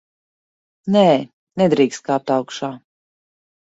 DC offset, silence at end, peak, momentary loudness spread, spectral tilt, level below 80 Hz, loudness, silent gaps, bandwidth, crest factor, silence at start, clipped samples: under 0.1%; 1 s; -2 dBFS; 15 LU; -6 dB/octave; -64 dBFS; -18 LUFS; 1.33-1.47 s; 8 kHz; 18 dB; 0.85 s; under 0.1%